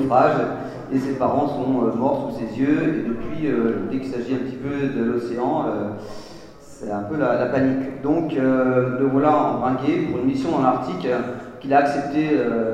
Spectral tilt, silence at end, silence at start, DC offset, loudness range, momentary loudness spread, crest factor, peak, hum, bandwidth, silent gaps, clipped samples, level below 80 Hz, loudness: -8 dB/octave; 0 s; 0 s; 0.1%; 4 LU; 9 LU; 18 dB; -2 dBFS; none; 9.2 kHz; none; under 0.1%; -52 dBFS; -21 LUFS